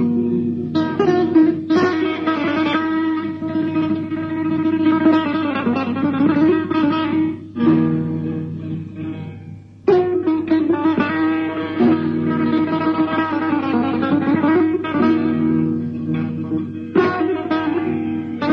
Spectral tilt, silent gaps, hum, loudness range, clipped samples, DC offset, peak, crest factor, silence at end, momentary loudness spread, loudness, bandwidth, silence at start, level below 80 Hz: -8.5 dB/octave; none; none; 3 LU; under 0.1%; under 0.1%; -4 dBFS; 14 dB; 0 s; 8 LU; -18 LUFS; 6 kHz; 0 s; -56 dBFS